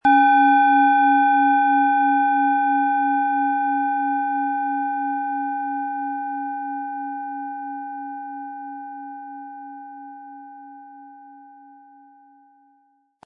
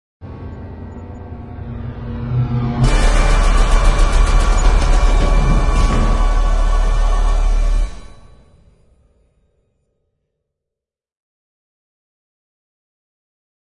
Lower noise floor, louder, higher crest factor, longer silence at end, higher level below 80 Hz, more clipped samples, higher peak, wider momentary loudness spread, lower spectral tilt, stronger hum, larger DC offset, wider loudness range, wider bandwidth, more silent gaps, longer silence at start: second, -62 dBFS vs -85 dBFS; about the same, -20 LUFS vs -18 LUFS; about the same, 16 dB vs 14 dB; second, 1.8 s vs 5.7 s; second, -72 dBFS vs -16 dBFS; neither; second, -6 dBFS vs 0 dBFS; first, 22 LU vs 16 LU; about the same, -5.5 dB/octave vs -5.5 dB/octave; neither; neither; first, 21 LU vs 8 LU; second, 4.4 kHz vs 11 kHz; neither; second, 0.05 s vs 0.2 s